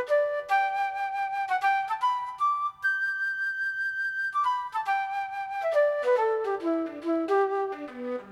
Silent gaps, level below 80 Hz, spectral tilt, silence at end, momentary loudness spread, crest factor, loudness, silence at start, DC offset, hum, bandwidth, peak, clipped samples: none; -76 dBFS; -3.5 dB/octave; 0 s; 6 LU; 12 dB; -28 LUFS; 0 s; under 0.1%; none; 14 kHz; -14 dBFS; under 0.1%